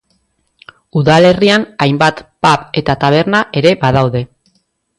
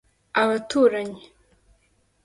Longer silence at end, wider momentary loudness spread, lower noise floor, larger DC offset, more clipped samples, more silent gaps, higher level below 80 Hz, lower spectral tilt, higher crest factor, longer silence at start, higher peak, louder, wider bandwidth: second, 0.75 s vs 1.05 s; second, 8 LU vs 15 LU; second, -61 dBFS vs -65 dBFS; neither; neither; neither; first, -42 dBFS vs -62 dBFS; first, -6 dB/octave vs -4.5 dB/octave; second, 12 dB vs 18 dB; first, 0.95 s vs 0.35 s; first, 0 dBFS vs -6 dBFS; first, -12 LUFS vs -22 LUFS; about the same, 11.5 kHz vs 11.5 kHz